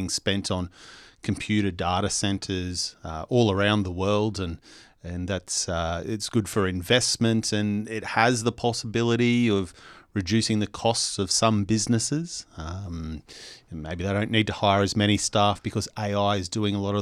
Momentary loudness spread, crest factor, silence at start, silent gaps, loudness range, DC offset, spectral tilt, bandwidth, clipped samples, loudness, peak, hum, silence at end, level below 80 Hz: 14 LU; 22 dB; 0 s; none; 3 LU; under 0.1%; -4.5 dB/octave; 13 kHz; under 0.1%; -25 LUFS; -4 dBFS; none; 0 s; -50 dBFS